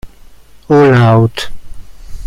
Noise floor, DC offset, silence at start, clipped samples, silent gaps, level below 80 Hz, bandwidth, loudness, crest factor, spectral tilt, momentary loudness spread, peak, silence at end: -36 dBFS; under 0.1%; 0.05 s; under 0.1%; none; -32 dBFS; 12.5 kHz; -9 LUFS; 12 dB; -7.5 dB/octave; 16 LU; 0 dBFS; 0 s